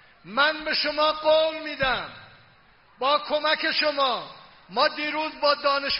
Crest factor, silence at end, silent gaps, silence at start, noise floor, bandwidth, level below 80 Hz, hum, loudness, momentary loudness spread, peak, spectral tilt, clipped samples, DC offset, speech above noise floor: 18 dB; 0 s; none; 0.25 s; -57 dBFS; 5.8 kHz; -56 dBFS; none; -24 LUFS; 8 LU; -8 dBFS; 1 dB/octave; under 0.1%; under 0.1%; 33 dB